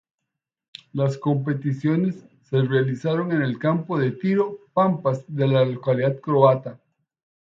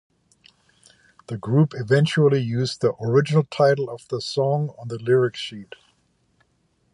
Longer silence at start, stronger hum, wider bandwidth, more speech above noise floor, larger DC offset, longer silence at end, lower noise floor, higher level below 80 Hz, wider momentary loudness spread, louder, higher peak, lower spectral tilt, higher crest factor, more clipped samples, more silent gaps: second, 0.95 s vs 1.3 s; neither; second, 7.6 kHz vs 11 kHz; first, 62 dB vs 46 dB; neither; second, 0.75 s vs 1.3 s; first, -83 dBFS vs -66 dBFS; about the same, -66 dBFS vs -62 dBFS; second, 7 LU vs 13 LU; about the same, -22 LUFS vs -21 LUFS; about the same, -2 dBFS vs -4 dBFS; first, -9 dB/octave vs -7 dB/octave; about the same, 20 dB vs 18 dB; neither; neither